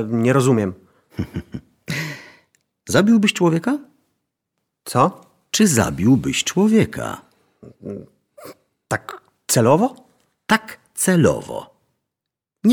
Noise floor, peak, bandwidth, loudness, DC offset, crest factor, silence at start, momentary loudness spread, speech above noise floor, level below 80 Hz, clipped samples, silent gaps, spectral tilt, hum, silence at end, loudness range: -84 dBFS; -2 dBFS; 19.5 kHz; -18 LUFS; under 0.1%; 18 dB; 0 s; 21 LU; 66 dB; -50 dBFS; under 0.1%; none; -5 dB/octave; none; 0 s; 4 LU